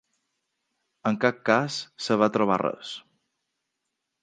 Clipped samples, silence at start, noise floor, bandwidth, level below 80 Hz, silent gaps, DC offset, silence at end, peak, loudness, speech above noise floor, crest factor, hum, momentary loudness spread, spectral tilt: under 0.1%; 1.05 s; -82 dBFS; 9.6 kHz; -70 dBFS; none; under 0.1%; 1.25 s; -4 dBFS; -25 LUFS; 57 dB; 24 dB; none; 14 LU; -5 dB/octave